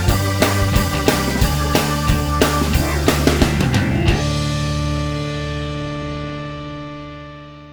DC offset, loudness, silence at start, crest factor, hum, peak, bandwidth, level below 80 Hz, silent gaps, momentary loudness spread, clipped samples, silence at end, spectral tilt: under 0.1%; -18 LUFS; 0 s; 18 dB; none; 0 dBFS; over 20 kHz; -26 dBFS; none; 14 LU; under 0.1%; 0 s; -5 dB/octave